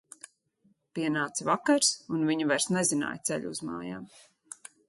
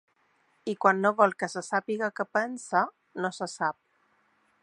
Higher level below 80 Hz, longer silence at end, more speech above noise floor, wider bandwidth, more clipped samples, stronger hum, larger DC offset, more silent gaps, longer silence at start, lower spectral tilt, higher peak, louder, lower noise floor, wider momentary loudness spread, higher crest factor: first, -72 dBFS vs -82 dBFS; about the same, 0.8 s vs 0.9 s; about the same, 40 dB vs 41 dB; about the same, 12 kHz vs 11.5 kHz; neither; neither; neither; neither; first, 0.95 s vs 0.65 s; second, -3 dB/octave vs -4.5 dB/octave; second, -12 dBFS vs -6 dBFS; about the same, -28 LUFS vs -28 LUFS; about the same, -69 dBFS vs -69 dBFS; first, 21 LU vs 10 LU; about the same, 20 dB vs 24 dB